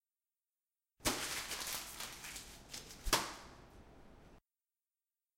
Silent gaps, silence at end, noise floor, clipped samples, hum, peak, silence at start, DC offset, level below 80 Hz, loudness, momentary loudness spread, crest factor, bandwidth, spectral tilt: none; 1 s; under -90 dBFS; under 0.1%; none; -18 dBFS; 1 s; under 0.1%; -56 dBFS; -40 LUFS; 25 LU; 28 dB; 16.5 kHz; -1.5 dB/octave